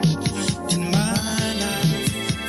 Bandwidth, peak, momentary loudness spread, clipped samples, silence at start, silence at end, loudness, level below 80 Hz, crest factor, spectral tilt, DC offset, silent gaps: 16 kHz; -6 dBFS; 3 LU; under 0.1%; 0 s; 0 s; -22 LUFS; -44 dBFS; 16 dB; -4.5 dB/octave; under 0.1%; none